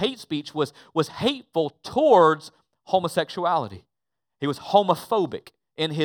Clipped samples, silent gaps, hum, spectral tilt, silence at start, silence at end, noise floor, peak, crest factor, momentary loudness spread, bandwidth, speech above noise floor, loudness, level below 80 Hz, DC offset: under 0.1%; none; none; -5.5 dB/octave; 0 s; 0 s; -88 dBFS; -4 dBFS; 20 dB; 13 LU; over 20 kHz; 65 dB; -23 LUFS; -66 dBFS; under 0.1%